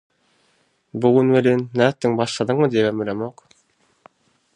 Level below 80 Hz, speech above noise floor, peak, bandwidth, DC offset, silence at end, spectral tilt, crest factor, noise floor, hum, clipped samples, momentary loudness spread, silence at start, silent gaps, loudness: -62 dBFS; 45 dB; -2 dBFS; 10.5 kHz; under 0.1%; 1.25 s; -6.5 dB/octave; 20 dB; -63 dBFS; none; under 0.1%; 12 LU; 0.95 s; none; -19 LUFS